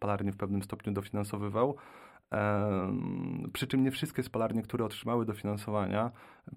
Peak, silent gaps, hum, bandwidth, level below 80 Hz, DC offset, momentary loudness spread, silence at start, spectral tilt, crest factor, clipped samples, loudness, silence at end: -16 dBFS; none; none; 16 kHz; -64 dBFS; under 0.1%; 7 LU; 0 s; -6.5 dB/octave; 18 dB; under 0.1%; -34 LUFS; 0 s